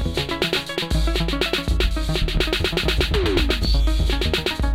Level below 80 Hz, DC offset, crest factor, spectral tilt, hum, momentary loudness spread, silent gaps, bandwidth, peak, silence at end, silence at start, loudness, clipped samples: -22 dBFS; under 0.1%; 16 dB; -5 dB/octave; none; 3 LU; none; 16 kHz; -4 dBFS; 0 s; 0 s; -21 LUFS; under 0.1%